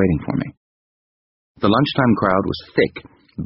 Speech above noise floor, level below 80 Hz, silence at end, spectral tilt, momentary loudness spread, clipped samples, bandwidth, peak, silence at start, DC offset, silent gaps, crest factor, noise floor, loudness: over 72 dB; -44 dBFS; 0 s; -5 dB/octave; 15 LU; under 0.1%; 5.8 kHz; -2 dBFS; 0 s; under 0.1%; 0.57-1.55 s; 18 dB; under -90 dBFS; -19 LUFS